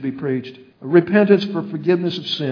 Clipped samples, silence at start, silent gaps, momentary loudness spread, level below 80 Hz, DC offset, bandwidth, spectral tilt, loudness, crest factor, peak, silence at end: under 0.1%; 0 s; none; 12 LU; -66 dBFS; under 0.1%; 5.4 kHz; -7.5 dB/octave; -18 LUFS; 18 dB; 0 dBFS; 0 s